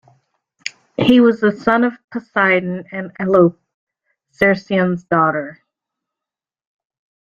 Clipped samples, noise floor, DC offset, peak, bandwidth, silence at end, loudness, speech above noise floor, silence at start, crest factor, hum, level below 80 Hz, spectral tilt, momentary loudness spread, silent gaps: under 0.1%; -88 dBFS; under 0.1%; -2 dBFS; 7.4 kHz; 1.8 s; -16 LUFS; 72 dB; 0.65 s; 16 dB; none; -56 dBFS; -7 dB/octave; 17 LU; 2.04-2.08 s, 3.74-3.87 s